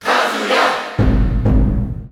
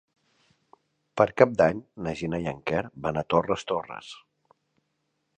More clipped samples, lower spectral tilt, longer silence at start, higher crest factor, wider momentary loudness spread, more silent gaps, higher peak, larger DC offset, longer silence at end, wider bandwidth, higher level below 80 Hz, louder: neither; about the same, -6 dB/octave vs -6.5 dB/octave; second, 0 s vs 1.15 s; second, 14 dB vs 26 dB; second, 3 LU vs 19 LU; neither; about the same, -2 dBFS vs -2 dBFS; neither; second, 0.05 s vs 1.25 s; first, 14 kHz vs 9.4 kHz; first, -20 dBFS vs -56 dBFS; first, -16 LUFS vs -26 LUFS